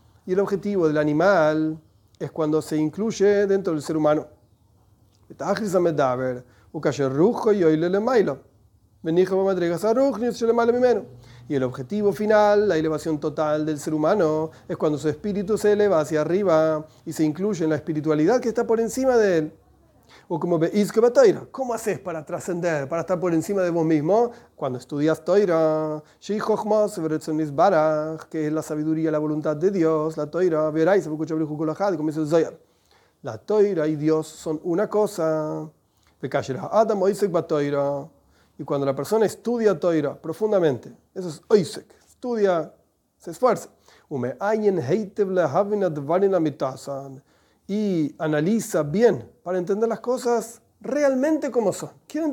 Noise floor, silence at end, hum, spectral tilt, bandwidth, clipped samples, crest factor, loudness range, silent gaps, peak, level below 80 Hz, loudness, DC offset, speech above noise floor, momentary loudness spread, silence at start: -60 dBFS; 0 s; none; -6.5 dB/octave; 17.5 kHz; under 0.1%; 18 dB; 3 LU; none; -4 dBFS; -62 dBFS; -22 LUFS; under 0.1%; 39 dB; 11 LU; 0.25 s